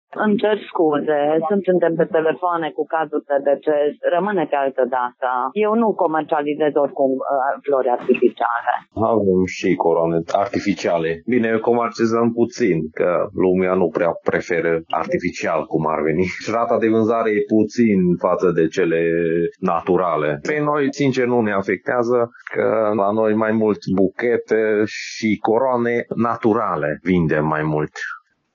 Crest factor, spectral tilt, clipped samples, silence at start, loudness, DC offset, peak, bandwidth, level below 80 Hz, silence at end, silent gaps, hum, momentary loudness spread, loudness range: 16 dB; -7 dB/octave; under 0.1%; 0.1 s; -19 LUFS; under 0.1%; -2 dBFS; 7.2 kHz; -56 dBFS; 0.35 s; none; none; 4 LU; 2 LU